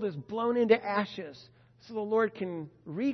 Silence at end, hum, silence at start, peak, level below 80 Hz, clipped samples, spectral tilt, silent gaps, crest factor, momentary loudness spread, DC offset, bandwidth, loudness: 0 s; none; 0 s; -10 dBFS; -74 dBFS; under 0.1%; -7.5 dB/octave; none; 20 dB; 15 LU; under 0.1%; 6.2 kHz; -30 LUFS